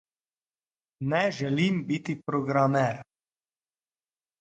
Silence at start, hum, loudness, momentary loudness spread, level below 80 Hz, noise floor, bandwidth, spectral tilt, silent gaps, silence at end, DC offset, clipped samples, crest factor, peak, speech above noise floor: 1 s; none; -27 LUFS; 7 LU; -68 dBFS; under -90 dBFS; 9 kHz; -6.5 dB/octave; none; 1.4 s; under 0.1%; under 0.1%; 20 dB; -10 dBFS; over 64 dB